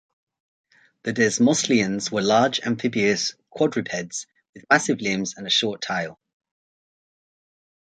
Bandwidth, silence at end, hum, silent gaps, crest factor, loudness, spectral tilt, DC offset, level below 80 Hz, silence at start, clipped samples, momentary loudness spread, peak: 9.4 kHz; 1.8 s; none; 4.49-4.53 s; 22 dB; -22 LUFS; -3.5 dB/octave; under 0.1%; -64 dBFS; 1.05 s; under 0.1%; 10 LU; -2 dBFS